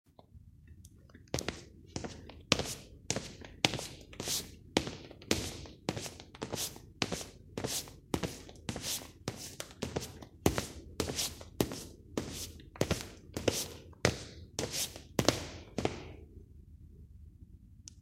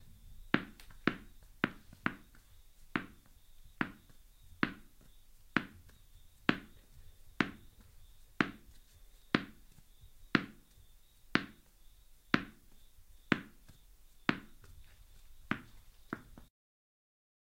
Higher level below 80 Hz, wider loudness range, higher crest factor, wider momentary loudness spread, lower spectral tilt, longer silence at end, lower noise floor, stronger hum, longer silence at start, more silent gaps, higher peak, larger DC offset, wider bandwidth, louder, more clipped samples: first, -54 dBFS vs -60 dBFS; about the same, 4 LU vs 4 LU; about the same, 36 dB vs 34 dB; about the same, 21 LU vs 23 LU; second, -3.5 dB/octave vs -5.5 dB/octave; second, 0 s vs 1.05 s; about the same, -57 dBFS vs -60 dBFS; neither; first, 0.35 s vs 0 s; neither; first, -4 dBFS vs -8 dBFS; neither; about the same, 16 kHz vs 16 kHz; about the same, -37 LUFS vs -38 LUFS; neither